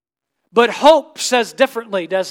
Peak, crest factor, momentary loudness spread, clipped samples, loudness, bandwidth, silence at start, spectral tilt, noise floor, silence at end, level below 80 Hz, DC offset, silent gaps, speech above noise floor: 0 dBFS; 16 dB; 8 LU; 0.1%; -15 LUFS; 17 kHz; 0.55 s; -2.5 dB/octave; -74 dBFS; 0 s; -60 dBFS; under 0.1%; none; 59 dB